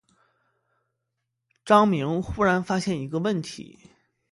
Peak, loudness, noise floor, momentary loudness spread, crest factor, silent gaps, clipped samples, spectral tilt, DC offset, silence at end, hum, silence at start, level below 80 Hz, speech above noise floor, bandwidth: -4 dBFS; -23 LUFS; -81 dBFS; 11 LU; 22 dB; none; under 0.1%; -6 dB/octave; under 0.1%; 0.7 s; none; 1.65 s; -52 dBFS; 57 dB; 11.5 kHz